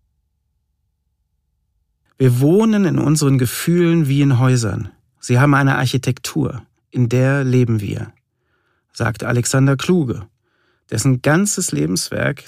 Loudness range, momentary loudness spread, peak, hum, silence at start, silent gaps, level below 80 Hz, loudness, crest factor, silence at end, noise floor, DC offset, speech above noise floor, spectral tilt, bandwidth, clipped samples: 4 LU; 12 LU; 0 dBFS; none; 2.2 s; none; -50 dBFS; -16 LUFS; 16 dB; 0.05 s; -69 dBFS; under 0.1%; 53 dB; -6 dB/octave; 15.5 kHz; under 0.1%